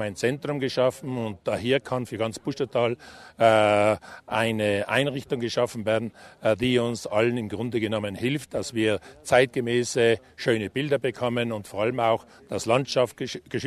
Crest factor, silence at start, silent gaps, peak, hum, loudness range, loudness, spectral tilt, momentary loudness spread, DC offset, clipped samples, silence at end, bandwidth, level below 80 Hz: 20 dB; 0 s; none; -4 dBFS; none; 2 LU; -25 LUFS; -5 dB/octave; 9 LU; under 0.1%; under 0.1%; 0 s; 13.5 kHz; -58 dBFS